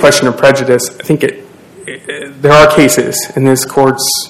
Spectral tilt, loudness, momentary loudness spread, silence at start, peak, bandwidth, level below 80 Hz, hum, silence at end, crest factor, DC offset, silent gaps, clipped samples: -4 dB/octave; -9 LUFS; 17 LU; 0 s; 0 dBFS; 16.5 kHz; -40 dBFS; none; 0 s; 10 dB; under 0.1%; none; 4%